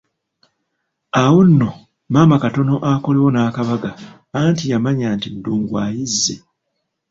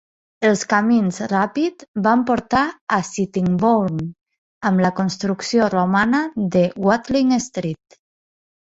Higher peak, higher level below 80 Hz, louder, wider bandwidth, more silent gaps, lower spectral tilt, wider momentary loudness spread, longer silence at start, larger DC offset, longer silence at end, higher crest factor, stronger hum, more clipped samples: about the same, -2 dBFS vs -2 dBFS; about the same, -50 dBFS vs -54 dBFS; first, -16 LUFS vs -19 LUFS; about the same, 8 kHz vs 8 kHz; second, none vs 1.88-1.94 s, 2.81-2.87 s, 4.38-4.61 s; about the same, -6 dB/octave vs -6 dB/octave; first, 11 LU vs 7 LU; first, 1.15 s vs 0.4 s; neither; second, 0.75 s vs 0.9 s; about the same, 16 dB vs 18 dB; neither; neither